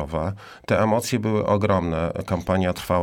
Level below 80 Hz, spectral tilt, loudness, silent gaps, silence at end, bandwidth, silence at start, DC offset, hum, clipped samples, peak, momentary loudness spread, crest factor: -44 dBFS; -6.5 dB/octave; -23 LUFS; none; 0 s; 17.5 kHz; 0 s; under 0.1%; none; under 0.1%; -8 dBFS; 7 LU; 16 dB